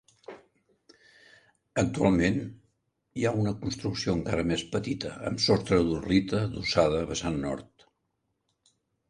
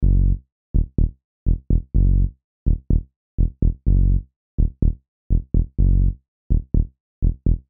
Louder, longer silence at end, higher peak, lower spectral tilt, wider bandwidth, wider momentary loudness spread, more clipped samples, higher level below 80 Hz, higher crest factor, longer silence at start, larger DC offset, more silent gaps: second, -28 LUFS vs -23 LUFS; first, 1.45 s vs 0.1 s; about the same, -8 dBFS vs -6 dBFS; second, -5.5 dB/octave vs -18.5 dB/octave; first, 11 kHz vs 0.9 kHz; about the same, 11 LU vs 9 LU; neither; second, -48 dBFS vs -20 dBFS; first, 22 dB vs 12 dB; first, 0.3 s vs 0 s; neither; second, none vs 0.52-0.74 s, 1.24-1.46 s, 2.44-2.66 s, 3.16-3.38 s, 4.36-4.58 s, 5.08-5.30 s, 6.28-6.50 s, 7.00-7.22 s